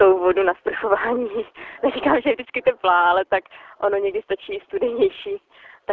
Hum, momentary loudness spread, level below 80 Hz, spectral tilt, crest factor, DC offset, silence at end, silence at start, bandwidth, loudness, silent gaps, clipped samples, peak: none; 12 LU; -56 dBFS; -7.5 dB/octave; 16 dB; under 0.1%; 0 s; 0 s; 4.3 kHz; -21 LUFS; none; under 0.1%; -4 dBFS